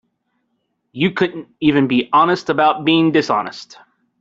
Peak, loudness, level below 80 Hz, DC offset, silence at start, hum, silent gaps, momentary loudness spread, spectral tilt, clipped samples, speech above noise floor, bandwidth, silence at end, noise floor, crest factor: -2 dBFS; -16 LUFS; -56 dBFS; under 0.1%; 0.95 s; none; none; 8 LU; -6 dB/octave; under 0.1%; 54 dB; 7.6 kHz; 0.55 s; -70 dBFS; 16 dB